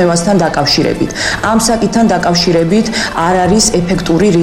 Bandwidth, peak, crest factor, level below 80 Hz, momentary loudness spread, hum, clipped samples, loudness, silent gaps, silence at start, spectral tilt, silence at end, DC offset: 16.5 kHz; -2 dBFS; 10 dB; -30 dBFS; 4 LU; none; under 0.1%; -11 LUFS; none; 0 s; -4.5 dB/octave; 0 s; under 0.1%